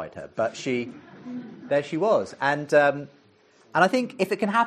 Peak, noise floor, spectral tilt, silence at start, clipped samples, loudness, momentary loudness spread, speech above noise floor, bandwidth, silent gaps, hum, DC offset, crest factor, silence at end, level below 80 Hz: -4 dBFS; -58 dBFS; -5.5 dB/octave; 0 s; under 0.1%; -24 LUFS; 17 LU; 34 dB; 13 kHz; none; none; under 0.1%; 20 dB; 0 s; -70 dBFS